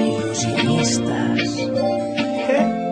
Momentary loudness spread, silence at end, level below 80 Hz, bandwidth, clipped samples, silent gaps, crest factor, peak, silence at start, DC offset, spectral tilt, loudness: 4 LU; 0 s; -54 dBFS; 10.5 kHz; under 0.1%; none; 14 dB; -4 dBFS; 0 s; under 0.1%; -4.5 dB/octave; -20 LUFS